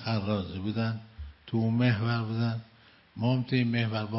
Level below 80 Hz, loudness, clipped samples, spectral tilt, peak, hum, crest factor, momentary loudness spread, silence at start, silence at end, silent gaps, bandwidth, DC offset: -56 dBFS; -30 LUFS; under 0.1%; -11 dB/octave; -12 dBFS; none; 18 dB; 13 LU; 0 s; 0 s; none; 5.8 kHz; under 0.1%